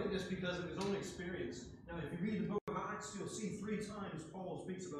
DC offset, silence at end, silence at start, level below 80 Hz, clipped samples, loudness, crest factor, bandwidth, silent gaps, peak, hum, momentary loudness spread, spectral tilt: under 0.1%; 0 s; 0 s; -64 dBFS; under 0.1%; -43 LUFS; 14 dB; 13 kHz; 2.61-2.67 s; -28 dBFS; none; 7 LU; -5.5 dB/octave